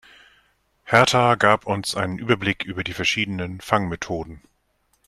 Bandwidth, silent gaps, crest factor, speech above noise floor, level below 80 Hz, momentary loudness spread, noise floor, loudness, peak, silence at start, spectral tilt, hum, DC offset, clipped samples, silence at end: 14 kHz; none; 22 dB; 46 dB; -52 dBFS; 12 LU; -67 dBFS; -21 LUFS; 0 dBFS; 0.85 s; -4.5 dB/octave; none; under 0.1%; under 0.1%; 0.7 s